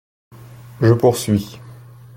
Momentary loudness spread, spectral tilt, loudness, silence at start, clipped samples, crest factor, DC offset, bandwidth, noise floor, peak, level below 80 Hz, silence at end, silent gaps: 20 LU; -6.5 dB/octave; -17 LUFS; 0.8 s; under 0.1%; 18 dB; under 0.1%; 16.5 kHz; -40 dBFS; -2 dBFS; -50 dBFS; 0.45 s; none